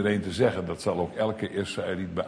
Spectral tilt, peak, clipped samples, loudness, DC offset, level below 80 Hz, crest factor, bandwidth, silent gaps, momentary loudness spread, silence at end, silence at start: -6 dB/octave; -10 dBFS; under 0.1%; -28 LUFS; under 0.1%; -56 dBFS; 16 dB; 10.5 kHz; none; 5 LU; 0 s; 0 s